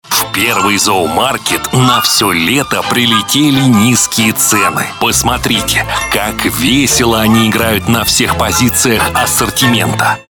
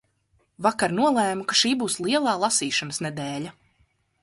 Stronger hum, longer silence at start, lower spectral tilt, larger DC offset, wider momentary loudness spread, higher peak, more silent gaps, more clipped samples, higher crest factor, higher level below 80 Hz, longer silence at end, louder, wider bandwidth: neither; second, 0.05 s vs 0.6 s; about the same, -3 dB/octave vs -3 dB/octave; neither; second, 4 LU vs 10 LU; first, 0 dBFS vs -6 dBFS; neither; neither; second, 10 dB vs 18 dB; first, -32 dBFS vs -64 dBFS; second, 0.1 s vs 0.7 s; first, -10 LUFS vs -23 LUFS; first, 19 kHz vs 12 kHz